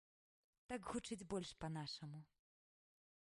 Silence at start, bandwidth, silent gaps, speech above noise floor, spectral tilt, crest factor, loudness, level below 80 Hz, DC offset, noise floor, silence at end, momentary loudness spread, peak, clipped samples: 0.7 s; 11.5 kHz; none; over 41 dB; -5 dB/octave; 20 dB; -49 LUFS; -72 dBFS; under 0.1%; under -90 dBFS; 1.1 s; 6 LU; -32 dBFS; under 0.1%